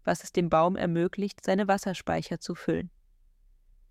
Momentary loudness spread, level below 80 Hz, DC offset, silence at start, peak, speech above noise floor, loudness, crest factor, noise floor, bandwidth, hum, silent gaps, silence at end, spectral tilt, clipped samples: 9 LU; -58 dBFS; under 0.1%; 0.05 s; -12 dBFS; 33 dB; -28 LUFS; 18 dB; -61 dBFS; 15 kHz; none; none; 1 s; -6 dB/octave; under 0.1%